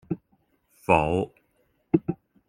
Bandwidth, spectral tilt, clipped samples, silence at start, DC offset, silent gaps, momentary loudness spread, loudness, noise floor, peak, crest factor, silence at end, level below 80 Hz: 15 kHz; -7.5 dB/octave; under 0.1%; 0.1 s; under 0.1%; none; 14 LU; -26 LUFS; -69 dBFS; -2 dBFS; 26 dB; 0.35 s; -52 dBFS